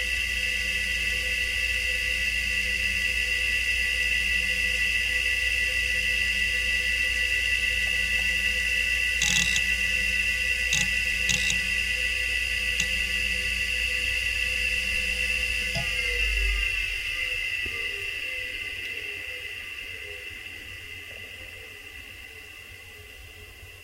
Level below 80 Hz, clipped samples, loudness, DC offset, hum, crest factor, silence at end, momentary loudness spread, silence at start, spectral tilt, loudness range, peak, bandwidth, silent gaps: -38 dBFS; under 0.1%; -24 LUFS; under 0.1%; none; 18 dB; 0 s; 16 LU; 0 s; -0.5 dB/octave; 12 LU; -8 dBFS; 16 kHz; none